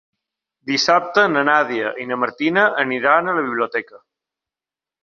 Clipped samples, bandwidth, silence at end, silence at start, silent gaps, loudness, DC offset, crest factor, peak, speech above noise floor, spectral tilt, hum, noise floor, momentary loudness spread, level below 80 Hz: under 0.1%; 7.6 kHz; 1.05 s; 0.65 s; none; -18 LUFS; under 0.1%; 20 dB; 0 dBFS; 72 dB; -3.5 dB/octave; none; -90 dBFS; 8 LU; -68 dBFS